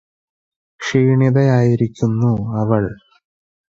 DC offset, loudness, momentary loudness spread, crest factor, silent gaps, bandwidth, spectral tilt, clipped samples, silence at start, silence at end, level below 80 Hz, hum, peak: under 0.1%; -16 LUFS; 6 LU; 16 dB; none; 7.6 kHz; -8 dB/octave; under 0.1%; 0.8 s; 0.8 s; -48 dBFS; none; -2 dBFS